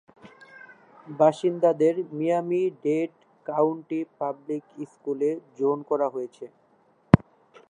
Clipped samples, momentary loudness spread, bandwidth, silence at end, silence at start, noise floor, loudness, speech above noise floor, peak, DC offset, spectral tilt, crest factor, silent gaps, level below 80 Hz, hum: under 0.1%; 15 LU; 10 kHz; 0.5 s; 0.25 s; -62 dBFS; -25 LUFS; 37 dB; 0 dBFS; under 0.1%; -8.5 dB/octave; 26 dB; none; -50 dBFS; none